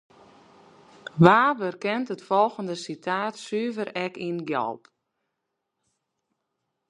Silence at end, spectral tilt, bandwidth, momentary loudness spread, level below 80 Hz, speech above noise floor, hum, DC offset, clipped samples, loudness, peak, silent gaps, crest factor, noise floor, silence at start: 2.15 s; -6.5 dB/octave; 11 kHz; 15 LU; -66 dBFS; 57 dB; none; under 0.1%; under 0.1%; -25 LUFS; 0 dBFS; none; 26 dB; -81 dBFS; 1.15 s